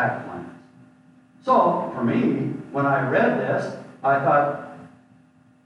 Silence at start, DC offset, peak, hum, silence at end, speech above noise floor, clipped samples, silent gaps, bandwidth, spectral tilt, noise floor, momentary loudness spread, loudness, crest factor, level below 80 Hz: 0 s; under 0.1%; -8 dBFS; none; 0.8 s; 34 dB; under 0.1%; none; 10 kHz; -8 dB/octave; -55 dBFS; 16 LU; -22 LUFS; 16 dB; -68 dBFS